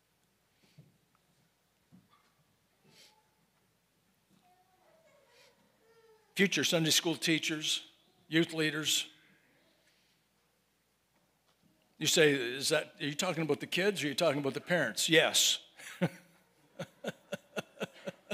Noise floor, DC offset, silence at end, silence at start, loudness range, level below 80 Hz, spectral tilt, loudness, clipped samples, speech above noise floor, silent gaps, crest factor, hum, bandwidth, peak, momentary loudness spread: -75 dBFS; under 0.1%; 0 s; 0.8 s; 7 LU; -86 dBFS; -2.5 dB/octave; -31 LUFS; under 0.1%; 44 dB; none; 26 dB; none; 16 kHz; -10 dBFS; 17 LU